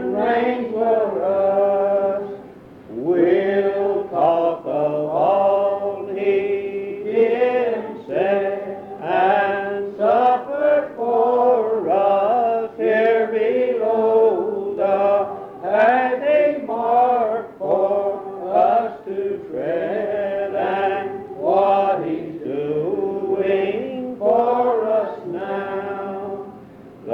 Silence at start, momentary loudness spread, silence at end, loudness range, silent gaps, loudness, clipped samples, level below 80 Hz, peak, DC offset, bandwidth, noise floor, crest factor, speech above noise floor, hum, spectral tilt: 0 s; 10 LU; 0 s; 3 LU; none; -20 LUFS; under 0.1%; -64 dBFS; -4 dBFS; under 0.1%; 5.6 kHz; -41 dBFS; 14 dB; 22 dB; none; -8 dB/octave